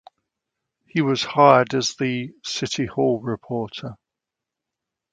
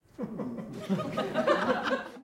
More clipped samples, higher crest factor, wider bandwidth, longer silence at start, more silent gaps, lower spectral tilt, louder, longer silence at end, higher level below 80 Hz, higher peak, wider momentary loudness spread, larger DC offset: neither; about the same, 22 dB vs 20 dB; second, 9.4 kHz vs 16 kHz; first, 0.95 s vs 0.2 s; neither; about the same, -5 dB/octave vs -6 dB/octave; first, -21 LUFS vs -31 LUFS; first, 1.2 s vs 0 s; first, -60 dBFS vs -66 dBFS; first, 0 dBFS vs -12 dBFS; first, 14 LU vs 11 LU; neither